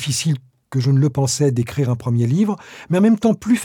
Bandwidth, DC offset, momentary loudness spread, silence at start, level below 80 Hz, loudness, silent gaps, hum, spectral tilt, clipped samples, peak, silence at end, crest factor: 16.5 kHz; under 0.1%; 7 LU; 0 s; -54 dBFS; -18 LUFS; none; none; -6 dB/octave; under 0.1%; -4 dBFS; 0 s; 12 dB